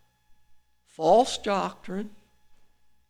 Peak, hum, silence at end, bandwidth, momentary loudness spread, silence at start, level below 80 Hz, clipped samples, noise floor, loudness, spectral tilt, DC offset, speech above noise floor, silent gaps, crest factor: -10 dBFS; 60 Hz at -60 dBFS; 0.95 s; 14 kHz; 15 LU; 1 s; -62 dBFS; under 0.1%; -58 dBFS; -25 LUFS; -4.5 dB/octave; under 0.1%; 34 dB; none; 20 dB